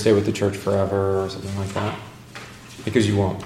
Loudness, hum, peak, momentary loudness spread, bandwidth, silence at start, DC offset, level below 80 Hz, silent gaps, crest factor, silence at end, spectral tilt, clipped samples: -23 LUFS; none; -4 dBFS; 19 LU; 14.5 kHz; 0 s; under 0.1%; -52 dBFS; none; 18 dB; 0 s; -6.5 dB/octave; under 0.1%